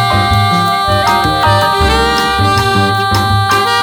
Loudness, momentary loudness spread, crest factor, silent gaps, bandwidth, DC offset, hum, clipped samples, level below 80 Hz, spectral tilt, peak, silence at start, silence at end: -11 LUFS; 1 LU; 10 dB; none; over 20 kHz; under 0.1%; none; under 0.1%; -26 dBFS; -4.5 dB/octave; 0 dBFS; 0 s; 0 s